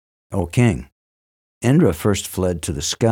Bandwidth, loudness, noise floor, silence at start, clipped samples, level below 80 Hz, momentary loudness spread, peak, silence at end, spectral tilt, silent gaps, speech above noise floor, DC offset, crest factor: 17.5 kHz; -20 LUFS; under -90 dBFS; 0.3 s; under 0.1%; -40 dBFS; 10 LU; -4 dBFS; 0 s; -5.5 dB/octave; 0.92-1.61 s; over 72 dB; under 0.1%; 16 dB